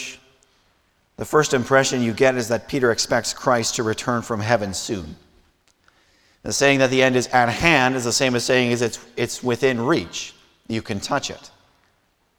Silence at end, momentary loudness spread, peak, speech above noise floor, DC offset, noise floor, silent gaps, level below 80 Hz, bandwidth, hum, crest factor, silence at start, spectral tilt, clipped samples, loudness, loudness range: 0.9 s; 14 LU; -2 dBFS; 44 dB; under 0.1%; -65 dBFS; none; -50 dBFS; 19.5 kHz; none; 20 dB; 0 s; -4 dB/octave; under 0.1%; -20 LUFS; 6 LU